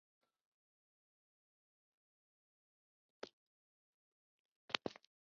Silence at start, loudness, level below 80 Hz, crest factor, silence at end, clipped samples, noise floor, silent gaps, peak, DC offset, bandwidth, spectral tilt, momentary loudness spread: 3.25 s; -44 LUFS; under -90 dBFS; 40 dB; 0.35 s; under 0.1%; under -90 dBFS; 3.33-4.68 s; -16 dBFS; under 0.1%; 6.6 kHz; -0.5 dB/octave; 15 LU